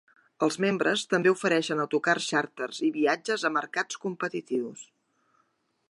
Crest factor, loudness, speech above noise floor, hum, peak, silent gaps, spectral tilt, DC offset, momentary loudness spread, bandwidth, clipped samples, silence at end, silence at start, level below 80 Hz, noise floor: 18 dB; -27 LUFS; 45 dB; none; -10 dBFS; none; -4 dB/octave; under 0.1%; 8 LU; 11.5 kHz; under 0.1%; 1.05 s; 0.4 s; -82 dBFS; -72 dBFS